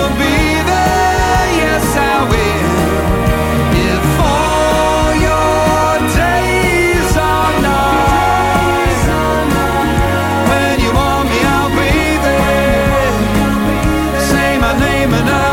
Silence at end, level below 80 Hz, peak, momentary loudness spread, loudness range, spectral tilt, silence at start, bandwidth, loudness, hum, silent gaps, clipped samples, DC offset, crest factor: 0 s; -22 dBFS; 0 dBFS; 2 LU; 1 LU; -5 dB/octave; 0 s; 17 kHz; -12 LUFS; none; none; under 0.1%; under 0.1%; 12 dB